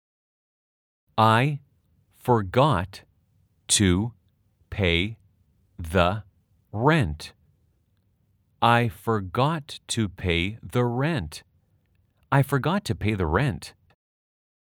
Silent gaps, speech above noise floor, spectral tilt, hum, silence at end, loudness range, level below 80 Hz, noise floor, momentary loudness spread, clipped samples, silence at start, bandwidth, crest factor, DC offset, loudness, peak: none; 44 dB; -5 dB/octave; none; 1.05 s; 3 LU; -48 dBFS; -67 dBFS; 17 LU; under 0.1%; 1.15 s; 18.5 kHz; 22 dB; under 0.1%; -24 LUFS; -4 dBFS